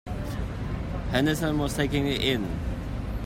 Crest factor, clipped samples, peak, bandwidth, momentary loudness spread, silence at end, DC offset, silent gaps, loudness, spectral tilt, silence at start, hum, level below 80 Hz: 18 dB; under 0.1%; -10 dBFS; 16 kHz; 8 LU; 0 s; under 0.1%; none; -28 LUFS; -5.5 dB/octave; 0.05 s; none; -36 dBFS